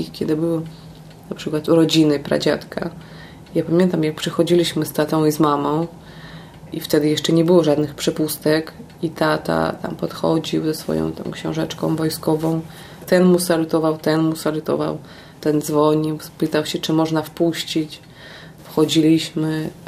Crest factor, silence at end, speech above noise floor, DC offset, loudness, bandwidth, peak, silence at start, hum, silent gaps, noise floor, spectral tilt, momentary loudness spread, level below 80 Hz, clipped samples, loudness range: 18 dB; 0 s; 21 dB; under 0.1%; -19 LUFS; 15.5 kHz; -2 dBFS; 0 s; none; none; -40 dBFS; -5.5 dB/octave; 17 LU; -52 dBFS; under 0.1%; 3 LU